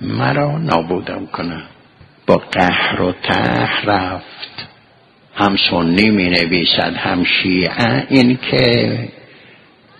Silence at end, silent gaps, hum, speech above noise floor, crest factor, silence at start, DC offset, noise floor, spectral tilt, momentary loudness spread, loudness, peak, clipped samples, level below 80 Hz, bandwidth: 0.9 s; none; none; 34 dB; 16 dB; 0 s; under 0.1%; -49 dBFS; -6.5 dB/octave; 14 LU; -15 LUFS; 0 dBFS; under 0.1%; -44 dBFS; 10.5 kHz